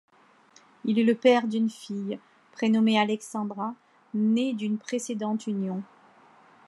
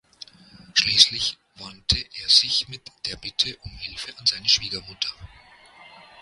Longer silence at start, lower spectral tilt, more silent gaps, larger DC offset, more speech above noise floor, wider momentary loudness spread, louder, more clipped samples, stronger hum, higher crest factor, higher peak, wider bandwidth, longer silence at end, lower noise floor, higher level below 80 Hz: first, 0.85 s vs 0.6 s; first, -5.5 dB/octave vs 0 dB/octave; neither; neither; first, 33 dB vs 26 dB; second, 13 LU vs 18 LU; second, -27 LUFS vs -20 LUFS; neither; neither; second, 18 dB vs 26 dB; second, -8 dBFS vs 0 dBFS; second, 12 kHz vs 16 kHz; about the same, 0.85 s vs 0.95 s; first, -58 dBFS vs -51 dBFS; second, -88 dBFS vs -48 dBFS